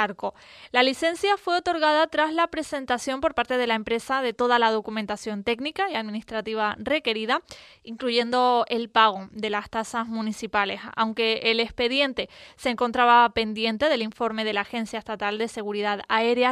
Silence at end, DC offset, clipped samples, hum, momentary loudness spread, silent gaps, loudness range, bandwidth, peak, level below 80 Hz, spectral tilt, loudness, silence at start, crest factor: 0 s; under 0.1%; under 0.1%; none; 9 LU; none; 3 LU; 13.5 kHz; -4 dBFS; -58 dBFS; -3.5 dB/octave; -24 LUFS; 0 s; 20 dB